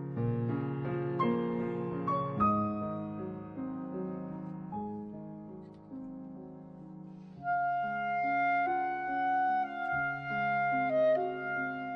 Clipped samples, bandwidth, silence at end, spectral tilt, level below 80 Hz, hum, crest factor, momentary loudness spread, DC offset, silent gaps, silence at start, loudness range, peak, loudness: under 0.1%; 6 kHz; 0 s; -9.5 dB/octave; -64 dBFS; none; 16 dB; 18 LU; under 0.1%; none; 0 s; 11 LU; -18 dBFS; -33 LUFS